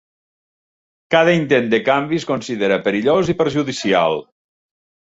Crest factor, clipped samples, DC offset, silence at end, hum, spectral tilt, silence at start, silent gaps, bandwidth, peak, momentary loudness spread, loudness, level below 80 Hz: 16 dB; under 0.1%; under 0.1%; 0.8 s; none; -5.5 dB/octave; 1.1 s; none; 8 kHz; -2 dBFS; 6 LU; -17 LUFS; -54 dBFS